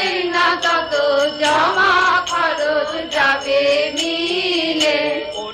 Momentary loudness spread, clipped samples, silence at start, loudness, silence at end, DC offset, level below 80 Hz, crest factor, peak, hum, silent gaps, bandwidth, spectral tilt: 5 LU; under 0.1%; 0 s; -16 LUFS; 0 s; under 0.1%; -52 dBFS; 14 dB; -4 dBFS; none; none; 14 kHz; -2 dB/octave